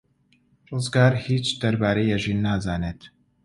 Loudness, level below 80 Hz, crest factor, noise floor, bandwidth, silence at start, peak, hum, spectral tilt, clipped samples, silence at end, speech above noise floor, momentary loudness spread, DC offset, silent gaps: -23 LUFS; -46 dBFS; 20 dB; -63 dBFS; 11 kHz; 0.7 s; -4 dBFS; none; -6 dB/octave; under 0.1%; 0.35 s; 41 dB; 12 LU; under 0.1%; none